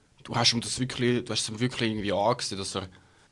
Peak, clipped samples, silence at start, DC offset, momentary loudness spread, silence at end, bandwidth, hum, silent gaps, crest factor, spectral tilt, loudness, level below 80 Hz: -8 dBFS; under 0.1%; 0.25 s; under 0.1%; 10 LU; 0.35 s; 11.5 kHz; none; none; 20 dB; -4 dB/octave; -27 LUFS; -58 dBFS